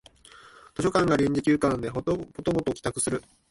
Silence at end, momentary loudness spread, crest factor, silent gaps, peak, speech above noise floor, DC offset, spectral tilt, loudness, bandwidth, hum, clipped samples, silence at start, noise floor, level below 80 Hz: 0.3 s; 7 LU; 16 dB; none; -10 dBFS; 26 dB; under 0.1%; -5.5 dB/octave; -26 LUFS; 11.5 kHz; none; under 0.1%; 0.45 s; -52 dBFS; -50 dBFS